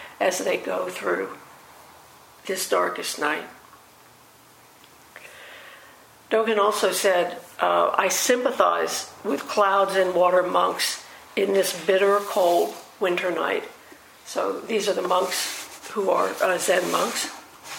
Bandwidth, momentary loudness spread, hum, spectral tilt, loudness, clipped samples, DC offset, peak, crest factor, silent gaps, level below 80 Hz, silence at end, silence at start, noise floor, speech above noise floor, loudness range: 16.5 kHz; 13 LU; none; -2 dB/octave; -23 LUFS; under 0.1%; under 0.1%; -2 dBFS; 22 dB; none; -72 dBFS; 0 s; 0 s; -52 dBFS; 29 dB; 8 LU